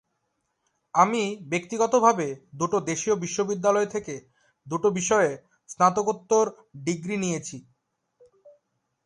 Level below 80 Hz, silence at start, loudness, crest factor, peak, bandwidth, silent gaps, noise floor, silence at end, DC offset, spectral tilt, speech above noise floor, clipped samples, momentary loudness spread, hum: -68 dBFS; 0.95 s; -25 LUFS; 22 dB; -4 dBFS; 11 kHz; none; -76 dBFS; 0.55 s; under 0.1%; -4.5 dB/octave; 52 dB; under 0.1%; 12 LU; none